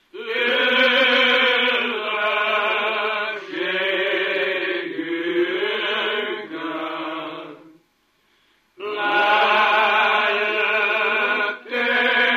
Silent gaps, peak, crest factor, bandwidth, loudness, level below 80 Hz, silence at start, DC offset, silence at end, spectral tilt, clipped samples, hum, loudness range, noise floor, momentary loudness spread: none; -4 dBFS; 16 dB; 15 kHz; -19 LUFS; -78 dBFS; 0.15 s; under 0.1%; 0 s; -3 dB/octave; under 0.1%; none; 8 LU; -64 dBFS; 12 LU